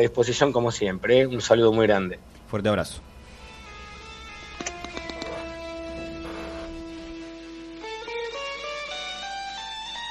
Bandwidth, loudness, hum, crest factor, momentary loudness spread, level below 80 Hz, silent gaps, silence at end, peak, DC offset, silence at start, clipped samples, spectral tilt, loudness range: 13 kHz; -26 LUFS; none; 22 dB; 20 LU; -48 dBFS; none; 0 s; -4 dBFS; under 0.1%; 0 s; under 0.1%; -4.5 dB/octave; 13 LU